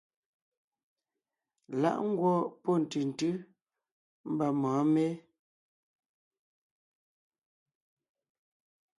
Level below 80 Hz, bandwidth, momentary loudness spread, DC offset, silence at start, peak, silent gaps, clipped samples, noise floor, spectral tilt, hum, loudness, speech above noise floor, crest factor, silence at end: -80 dBFS; 11.5 kHz; 11 LU; under 0.1%; 1.7 s; -16 dBFS; 3.92-4.24 s; under 0.1%; under -90 dBFS; -7.5 dB/octave; none; -31 LUFS; over 60 dB; 20 dB; 3.8 s